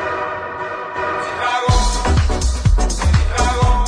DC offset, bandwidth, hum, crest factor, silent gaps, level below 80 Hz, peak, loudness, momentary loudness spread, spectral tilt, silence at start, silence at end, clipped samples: under 0.1%; 10.5 kHz; none; 14 dB; none; -18 dBFS; -2 dBFS; -18 LUFS; 8 LU; -4.5 dB/octave; 0 s; 0 s; under 0.1%